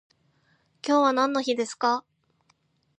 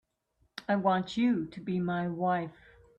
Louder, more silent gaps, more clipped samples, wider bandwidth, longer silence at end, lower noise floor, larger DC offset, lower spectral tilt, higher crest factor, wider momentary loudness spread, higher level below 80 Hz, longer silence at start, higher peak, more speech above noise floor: first, -25 LUFS vs -31 LUFS; neither; neither; first, 10.5 kHz vs 8.6 kHz; first, 1 s vs 0.45 s; second, -68 dBFS vs -73 dBFS; neither; second, -3 dB/octave vs -7.5 dB/octave; about the same, 20 dB vs 16 dB; second, 8 LU vs 13 LU; second, -82 dBFS vs -66 dBFS; first, 0.85 s vs 0.55 s; first, -8 dBFS vs -16 dBFS; about the same, 44 dB vs 44 dB